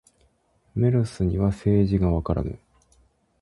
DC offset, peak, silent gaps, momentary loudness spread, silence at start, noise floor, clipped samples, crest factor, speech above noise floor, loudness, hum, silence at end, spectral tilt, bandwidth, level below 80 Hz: under 0.1%; -8 dBFS; none; 13 LU; 0.75 s; -64 dBFS; under 0.1%; 16 dB; 43 dB; -24 LUFS; none; 0.85 s; -9.5 dB/octave; 11.5 kHz; -36 dBFS